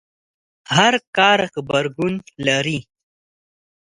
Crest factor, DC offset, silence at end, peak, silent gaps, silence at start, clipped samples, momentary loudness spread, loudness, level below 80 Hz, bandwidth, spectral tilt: 20 dB; under 0.1%; 1.05 s; 0 dBFS; 1.07-1.13 s; 0.7 s; under 0.1%; 9 LU; -18 LUFS; -58 dBFS; 11.5 kHz; -4 dB/octave